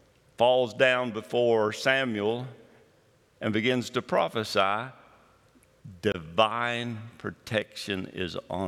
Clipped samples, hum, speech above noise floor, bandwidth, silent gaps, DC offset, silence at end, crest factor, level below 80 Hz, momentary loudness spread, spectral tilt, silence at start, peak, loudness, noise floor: under 0.1%; none; 36 dB; 15.5 kHz; none; under 0.1%; 0 s; 22 dB; -68 dBFS; 11 LU; -5 dB/octave; 0.4 s; -6 dBFS; -27 LUFS; -63 dBFS